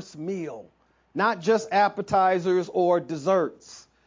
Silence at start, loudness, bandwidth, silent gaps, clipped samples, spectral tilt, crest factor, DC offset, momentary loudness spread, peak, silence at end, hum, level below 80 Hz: 0 s; -24 LUFS; 7.6 kHz; none; under 0.1%; -5.5 dB/octave; 16 dB; under 0.1%; 12 LU; -10 dBFS; 0.25 s; none; -64 dBFS